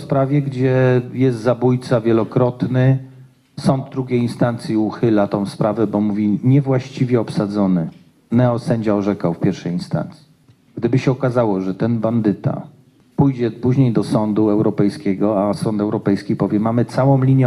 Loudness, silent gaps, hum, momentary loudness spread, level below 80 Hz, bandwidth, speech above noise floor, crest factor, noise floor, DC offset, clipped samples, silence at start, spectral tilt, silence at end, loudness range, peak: -18 LUFS; none; none; 6 LU; -54 dBFS; 11.5 kHz; 35 dB; 16 dB; -52 dBFS; under 0.1%; under 0.1%; 0 s; -8.5 dB/octave; 0 s; 3 LU; -2 dBFS